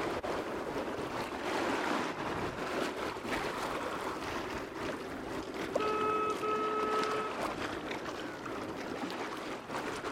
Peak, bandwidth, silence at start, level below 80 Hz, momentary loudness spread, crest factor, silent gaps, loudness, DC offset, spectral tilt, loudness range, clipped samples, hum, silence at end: -18 dBFS; 16 kHz; 0 s; -60 dBFS; 8 LU; 18 dB; none; -36 LUFS; under 0.1%; -4.5 dB/octave; 3 LU; under 0.1%; none; 0 s